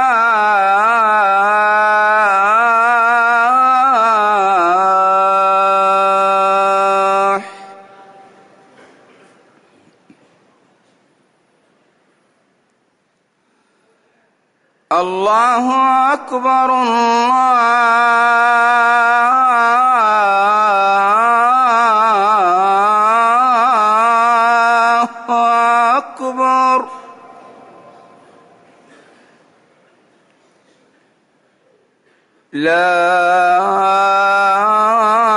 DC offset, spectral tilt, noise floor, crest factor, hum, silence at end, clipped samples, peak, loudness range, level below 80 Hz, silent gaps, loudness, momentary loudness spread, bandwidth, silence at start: under 0.1%; -3.5 dB/octave; -62 dBFS; 10 dB; none; 0 s; under 0.1%; -4 dBFS; 8 LU; -68 dBFS; none; -12 LUFS; 4 LU; 11 kHz; 0 s